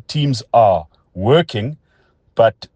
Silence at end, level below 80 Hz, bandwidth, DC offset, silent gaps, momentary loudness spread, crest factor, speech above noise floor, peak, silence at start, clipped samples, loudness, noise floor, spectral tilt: 0.1 s; -52 dBFS; 9.4 kHz; under 0.1%; none; 12 LU; 16 dB; 43 dB; 0 dBFS; 0.1 s; under 0.1%; -16 LUFS; -58 dBFS; -6.5 dB/octave